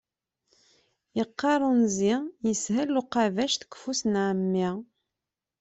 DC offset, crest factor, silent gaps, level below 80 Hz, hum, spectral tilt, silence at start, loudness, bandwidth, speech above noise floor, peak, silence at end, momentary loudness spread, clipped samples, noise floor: under 0.1%; 16 dB; none; -68 dBFS; none; -4.5 dB/octave; 1.15 s; -27 LUFS; 8.2 kHz; 62 dB; -12 dBFS; 0.75 s; 8 LU; under 0.1%; -88 dBFS